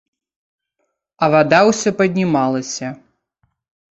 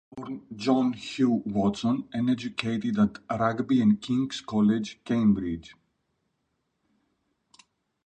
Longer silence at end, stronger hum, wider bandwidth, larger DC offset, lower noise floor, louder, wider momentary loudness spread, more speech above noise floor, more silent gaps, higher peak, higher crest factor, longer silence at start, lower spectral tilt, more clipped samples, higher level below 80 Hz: second, 1 s vs 2.35 s; neither; about the same, 8.2 kHz vs 8.8 kHz; neither; second, -72 dBFS vs -77 dBFS; first, -16 LUFS vs -26 LUFS; first, 13 LU vs 7 LU; first, 57 dB vs 51 dB; neither; first, 0 dBFS vs -10 dBFS; about the same, 18 dB vs 18 dB; first, 1.2 s vs 0.15 s; second, -5 dB/octave vs -6.5 dB/octave; neither; about the same, -60 dBFS vs -58 dBFS